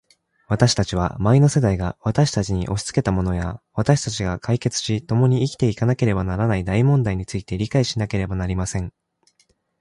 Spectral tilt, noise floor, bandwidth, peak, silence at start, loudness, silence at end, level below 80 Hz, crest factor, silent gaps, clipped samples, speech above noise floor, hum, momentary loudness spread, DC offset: -6 dB/octave; -64 dBFS; 11.5 kHz; -4 dBFS; 0.5 s; -21 LUFS; 0.9 s; -38 dBFS; 18 dB; none; under 0.1%; 44 dB; none; 8 LU; under 0.1%